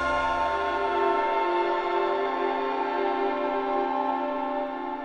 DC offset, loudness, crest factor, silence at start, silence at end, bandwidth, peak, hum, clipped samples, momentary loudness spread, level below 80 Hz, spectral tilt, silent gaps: under 0.1%; -26 LUFS; 14 dB; 0 s; 0 s; 9 kHz; -12 dBFS; none; under 0.1%; 4 LU; -54 dBFS; -5 dB/octave; none